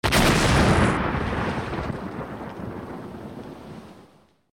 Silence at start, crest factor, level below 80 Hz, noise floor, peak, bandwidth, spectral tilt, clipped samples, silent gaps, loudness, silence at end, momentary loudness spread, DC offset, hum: 0.05 s; 16 dB; -34 dBFS; -55 dBFS; -8 dBFS; 19 kHz; -5 dB/octave; under 0.1%; none; -23 LUFS; 0.5 s; 21 LU; under 0.1%; none